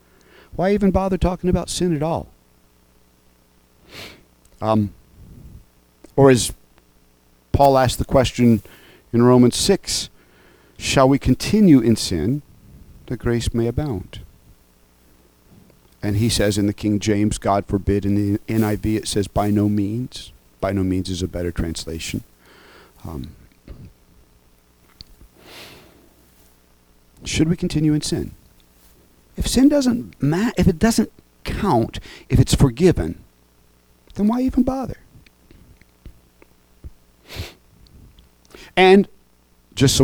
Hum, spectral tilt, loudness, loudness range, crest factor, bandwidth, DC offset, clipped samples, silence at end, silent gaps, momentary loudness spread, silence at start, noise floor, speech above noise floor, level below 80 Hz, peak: 60 Hz at -50 dBFS; -5.5 dB/octave; -19 LUFS; 11 LU; 20 dB; over 20 kHz; under 0.1%; under 0.1%; 0 s; none; 20 LU; 0.55 s; -56 dBFS; 38 dB; -36 dBFS; -2 dBFS